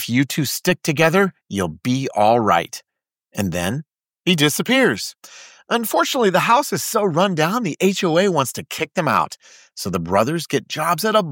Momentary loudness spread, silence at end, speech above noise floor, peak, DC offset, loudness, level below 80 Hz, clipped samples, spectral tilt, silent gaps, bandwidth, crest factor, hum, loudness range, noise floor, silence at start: 10 LU; 0 s; 44 dB; -2 dBFS; under 0.1%; -19 LUFS; -56 dBFS; under 0.1%; -4.5 dB/octave; none; 17 kHz; 16 dB; none; 3 LU; -63 dBFS; 0 s